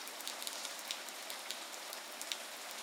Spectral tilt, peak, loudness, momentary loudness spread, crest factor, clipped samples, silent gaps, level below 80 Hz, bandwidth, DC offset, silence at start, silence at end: 1.5 dB/octave; -18 dBFS; -42 LUFS; 3 LU; 28 dB; under 0.1%; none; under -90 dBFS; 18 kHz; under 0.1%; 0 s; 0 s